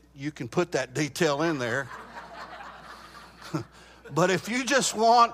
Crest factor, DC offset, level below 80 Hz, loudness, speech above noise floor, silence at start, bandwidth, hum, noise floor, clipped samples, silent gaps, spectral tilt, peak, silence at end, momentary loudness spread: 20 dB; under 0.1%; -60 dBFS; -26 LUFS; 22 dB; 0.15 s; 15.5 kHz; none; -47 dBFS; under 0.1%; none; -4 dB/octave; -8 dBFS; 0 s; 22 LU